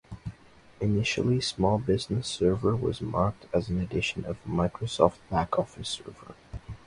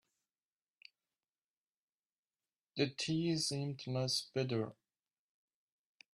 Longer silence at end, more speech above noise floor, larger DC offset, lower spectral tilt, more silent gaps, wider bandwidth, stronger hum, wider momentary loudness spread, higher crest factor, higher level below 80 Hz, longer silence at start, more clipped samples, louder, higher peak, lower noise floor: second, 0.1 s vs 1.45 s; second, 25 dB vs over 53 dB; neither; first, -6 dB/octave vs -4.5 dB/octave; neither; about the same, 11.5 kHz vs 12.5 kHz; neither; first, 17 LU vs 6 LU; about the same, 24 dB vs 22 dB; first, -46 dBFS vs -78 dBFS; second, 0.1 s vs 2.75 s; neither; first, -28 LUFS vs -38 LUFS; first, -4 dBFS vs -20 dBFS; second, -53 dBFS vs under -90 dBFS